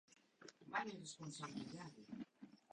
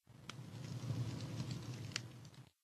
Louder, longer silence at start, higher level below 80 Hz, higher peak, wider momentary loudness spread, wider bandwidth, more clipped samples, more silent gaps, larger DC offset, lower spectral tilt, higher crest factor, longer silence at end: second, -50 LUFS vs -46 LUFS; about the same, 0.1 s vs 0.1 s; second, -86 dBFS vs -70 dBFS; second, -28 dBFS vs -20 dBFS; first, 17 LU vs 11 LU; second, 10 kHz vs 13 kHz; neither; neither; neither; about the same, -4 dB/octave vs -5 dB/octave; about the same, 24 dB vs 26 dB; about the same, 0.15 s vs 0.15 s